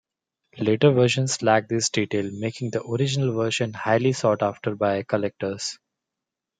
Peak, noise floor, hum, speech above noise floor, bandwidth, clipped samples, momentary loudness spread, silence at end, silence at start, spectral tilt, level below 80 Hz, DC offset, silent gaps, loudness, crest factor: -4 dBFS; -86 dBFS; none; 63 dB; 9.6 kHz; under 0.1%; 9 LU; 0.85 s; 0.55 s; -5 dB/octave; -66 dBFS; under 0.1%; none; -23 LUFS; 20 dB